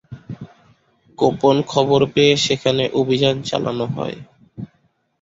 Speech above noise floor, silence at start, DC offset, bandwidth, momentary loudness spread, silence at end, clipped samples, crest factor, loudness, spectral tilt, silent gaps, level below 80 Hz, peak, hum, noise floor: 46 dB; 0.1 s; under 0.1%; 7.8 kHz; 22 LU; 0.55 s; under 0.1%; 18 dB; -18 LUFS; -5 dB/octave; none; -54 dBFS; -2 dBFS; none; -63 dBFS